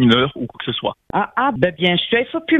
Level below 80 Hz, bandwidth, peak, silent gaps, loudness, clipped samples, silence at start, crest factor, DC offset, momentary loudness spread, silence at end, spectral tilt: -50 dBFS; 7.4 kHz; 0 dBFS; none; -19 LUFS; under 0.1%; 0 s; 18 dB; under 0.1%; 8 LU; 0 s; -7 dB/octave